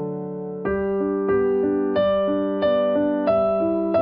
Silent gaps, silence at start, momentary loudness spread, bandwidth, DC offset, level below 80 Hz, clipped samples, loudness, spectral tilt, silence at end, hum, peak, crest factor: none; 0 s; 7 LU; 5.2 kHz; under 0.1%; -50 dBFS; under 0.1%; -22 LUFS; -6 dB/octave; 0 s; none; -10 dBFS; 12 dB